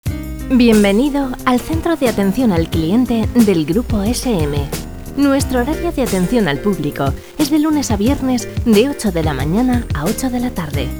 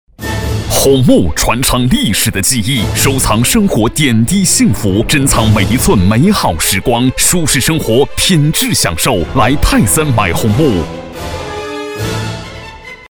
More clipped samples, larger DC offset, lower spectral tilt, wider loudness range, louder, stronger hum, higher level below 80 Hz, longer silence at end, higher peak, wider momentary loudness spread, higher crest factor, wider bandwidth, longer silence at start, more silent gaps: neither; first, 0.8% vs under 0.1%; first, -6 dB/octave vs -4 dB/octave; about the same, 2 LU vs 3 LU; second, -16 LUFS vs -11 LUFS; neither; about the same, -28 dBFS vs -24 dBFS; about the same, 0 s vs 0.1 s; about the same, 0 dBFS vs 0 dBFS; second, 7 LU vs 12 LU; about the same, 16 dB vs 12 dB; about the same, over 20 kHz vs over 20 kHz; second, 0.05 s vs 0.2 s; neither